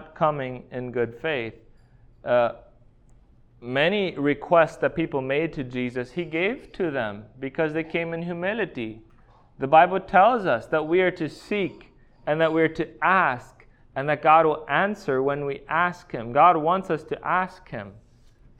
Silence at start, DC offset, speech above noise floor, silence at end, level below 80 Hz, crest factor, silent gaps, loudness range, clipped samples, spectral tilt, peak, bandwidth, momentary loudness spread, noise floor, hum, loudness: 0 s; under 0.1%; 31 dB; 0.6 s; -54 dBFS; 20 dB; none; 6 LU; under 0.1%; -7 dB/octave; -4 dBFS; 9.8 kHz; 15 LU; -54 dBFS; none; -23 LUFS